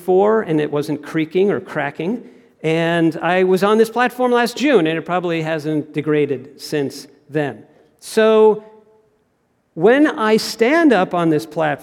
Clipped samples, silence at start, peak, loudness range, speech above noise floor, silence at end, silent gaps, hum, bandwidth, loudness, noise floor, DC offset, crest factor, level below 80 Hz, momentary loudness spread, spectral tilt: under 0.1%; 0 s; -2 dBFS; 4 LU; 47 dB; 0 s; none; none; 16 kHz; -17 LUFS; -64 dBFS; under 0.1%; 16 dB; -66 dBFS; 11 LU; -6 dB/octave